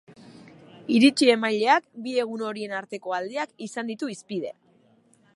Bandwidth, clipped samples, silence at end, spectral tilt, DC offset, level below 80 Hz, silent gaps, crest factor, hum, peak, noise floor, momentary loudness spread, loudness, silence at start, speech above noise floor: 11.5 kHz; under 0.1%; 0.85 s; -4 dB/octave; under 0.1%; -78 dBFS; none; 20 dB; none; -6 dBFS; -61 dBFS; 14 LU; -24 LUFS; 0.1 s; 36 dB